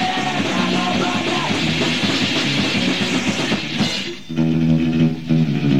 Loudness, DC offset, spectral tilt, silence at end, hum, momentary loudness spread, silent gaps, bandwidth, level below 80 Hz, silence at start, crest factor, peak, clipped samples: -18 LUFS; 1%; -5 dB/octave; 0 s; none; 3 LU; none; 13.5 kHz; -46 dBFS; 0 s; 14 dB; -4 dBFS; under 0.1%